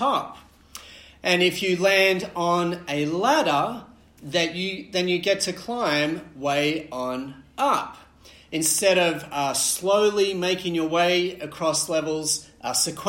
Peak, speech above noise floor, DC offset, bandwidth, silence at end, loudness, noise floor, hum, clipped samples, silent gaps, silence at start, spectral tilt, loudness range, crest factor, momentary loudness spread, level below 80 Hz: -6 dBFS; 22 dB; under 0.1%; 16.5 kHz; 0 s; -23 LUFS; -45 dBFS; none; under 0.1%; none; 0 s; -3 dB/octave; 3 LU; 18 dB; 10 LU; -60 dBFS